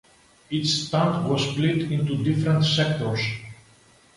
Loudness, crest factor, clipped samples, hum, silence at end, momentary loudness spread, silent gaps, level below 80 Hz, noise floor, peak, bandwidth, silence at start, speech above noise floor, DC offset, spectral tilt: -23 LUFS; 16 dB; under 0.1%; none; 0.65 s; 8 LU; none; -56 dBFS; -55 dBFS; -8 dBFS; 11.5 kHz; 0.5 s; 33 dB; under 0.1%; -5.5 dB/octave